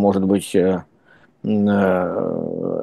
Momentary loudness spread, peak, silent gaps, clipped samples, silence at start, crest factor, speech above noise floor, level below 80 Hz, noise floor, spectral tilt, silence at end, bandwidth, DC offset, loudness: 8 LU; -4 dBFS; none; under 0.1%; 0 s; 16 dB; 35 dB; -60 dBFS; -53 dBFS; -7 dB/octave; 0 s; 12.5 kHz; under 0.1%; -19 LUFS